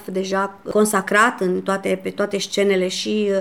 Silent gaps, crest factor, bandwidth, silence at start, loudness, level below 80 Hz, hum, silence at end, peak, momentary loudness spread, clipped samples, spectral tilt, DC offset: none; 18 dB; 16.5 kHz; 0 s; -20 LUFS; -62 dBFS; none; 0 s; -2 dBFS; 7 LU; under 0.1%; -4 dB/octave; 0.2%